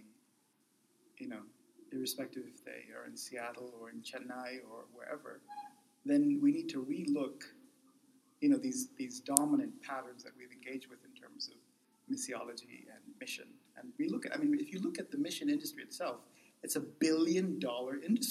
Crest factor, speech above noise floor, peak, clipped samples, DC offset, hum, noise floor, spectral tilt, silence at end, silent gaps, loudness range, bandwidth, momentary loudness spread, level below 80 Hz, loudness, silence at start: 38 dB; 37 dB; 0 dBFS; under 0.1%; under 0.1%; none; -74 dBFS; -4 dB/octave; 0 s; none; 11 LU; 15 kHz; 20 LU; under -90 dBFS; -37 LUFS; 0 s